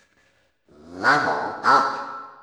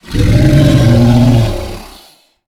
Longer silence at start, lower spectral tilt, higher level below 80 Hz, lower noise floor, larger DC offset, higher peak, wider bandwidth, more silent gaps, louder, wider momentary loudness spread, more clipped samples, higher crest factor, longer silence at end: first, 0.85 s vs 0.05 s; second, -3.5 dB/octave vs -7.5 dB/octave; second, -68 dBFS vs -20 dBFS; first, -64 dBFS vs -44 dBFS; neither; second, -6 dBFS vs 0 dBFS; second, 12 kHz vs 15 kHz; neither; second, -20 LUFS vs -9 LUFS; second, 12 LU vs 16 LU; neither; first, 18 dB vs 10 dB; second, 0.1 s vs 0.6 s